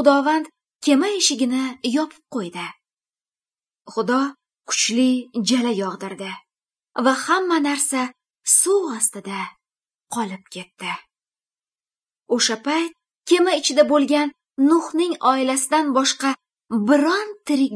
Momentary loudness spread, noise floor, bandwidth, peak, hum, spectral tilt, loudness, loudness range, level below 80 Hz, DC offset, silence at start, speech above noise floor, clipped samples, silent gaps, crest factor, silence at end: 14 LU; under -90 dBFS; 11 kHz; -2 dBFS; none; -2.5 dB/octave; -20 LUFS; 7 LU; -78 dBFS; under 0.1%; 0 s; over 70 dB; under 0.1%; none; 20 dB; 0 s